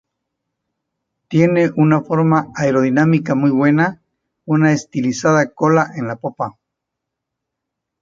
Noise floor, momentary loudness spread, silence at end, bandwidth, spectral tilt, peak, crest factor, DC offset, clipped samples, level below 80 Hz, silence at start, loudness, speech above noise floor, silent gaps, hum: -80 dBFS; 10 LU; 1.5 s; 7.6 kHz; -7 dB/octave; 0 dBFS; 16 dB; under 0.1%; under 0.1%; -58 dBFS; 1.3 s; -16 LUFS; 65 dB; none; none